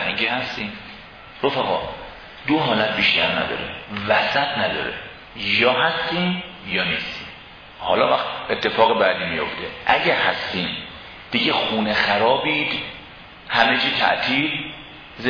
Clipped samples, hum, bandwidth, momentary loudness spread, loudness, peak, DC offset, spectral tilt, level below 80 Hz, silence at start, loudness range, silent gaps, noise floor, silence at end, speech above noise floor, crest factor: under 0.1%; none; 5.4 kHz; 19 LU; -20 LUFS; -2 dBFS; under 0.1%; -5.5 dB/octave; -52 dBFS; 0 s; 2 LU; none; -41 dBFS; 0 s; 21 dB; 20 dB